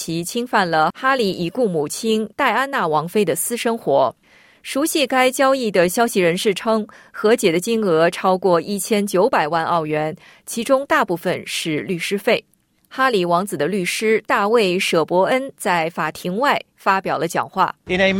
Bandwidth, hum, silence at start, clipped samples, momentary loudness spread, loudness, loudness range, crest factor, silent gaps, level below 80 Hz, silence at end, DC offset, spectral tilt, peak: 17 kHz; none; 0 s; under 0.1%; 6 LU; -19 LUFS; 3 LU; 16 dB; none; -58 dBFS; 0 s; under 0.1%; -4 dB/octave; -4 dBFS